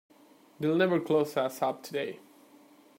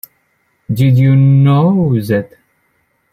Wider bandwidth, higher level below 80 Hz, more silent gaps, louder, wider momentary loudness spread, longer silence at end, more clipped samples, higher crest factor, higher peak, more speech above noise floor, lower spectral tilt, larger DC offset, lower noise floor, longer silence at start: about the same, 16 kHz vs 15 kHz; second, -80 dBFS vs -46 dBFS; neither; second, -30 LUFS vs -11 LUFS; about the same, 10 LU vs 9 LU; about the same, 0.8 s vs 0.85 s; neither; first, 20 dB vs 12 dB; second, -12 dBFS vs -2 dBFS; second, 30 dB vs 51 dB; second, -6 dB/octave vs -9 dB/octave; neither; about the same, -59 dBFS vs -61 dBFS; about the same, 0.6 s vs 0.7 s